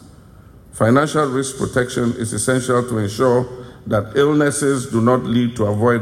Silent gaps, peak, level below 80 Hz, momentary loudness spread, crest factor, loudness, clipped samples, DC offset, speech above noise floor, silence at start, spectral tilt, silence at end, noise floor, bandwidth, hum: none; -4 dBFS; -46 dBFS; 6 LU; 14 dB; -18 LUFS; under 0.1%; under 0.1%; 26 dB; 0 s; -5.5 dB/octave; 0 s; -43 dBFS; 15.5 kHz; none